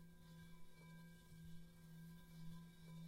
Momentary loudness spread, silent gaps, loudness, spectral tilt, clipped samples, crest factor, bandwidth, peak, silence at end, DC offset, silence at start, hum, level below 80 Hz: 4 LU; none; -61 LUFS; -6 dB/octave; under 0.1%; 14 dB; 16 kHz; -44 dBFS; 0 s; under 0.1%; 0 s; none; -70 dBFS